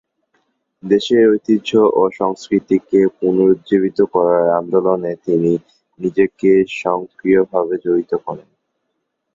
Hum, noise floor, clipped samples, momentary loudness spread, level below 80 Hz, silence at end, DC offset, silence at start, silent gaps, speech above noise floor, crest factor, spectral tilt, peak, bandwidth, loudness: none; -73 dBFS; under 0.1%; 8 LU; -58 dBFS; 0.95 s; under 0.1%; 0.85 s; none; 57 dB; 14 dB; -7 dB/octave; -2 dBFS; 7.6 kHz; -16 LUFS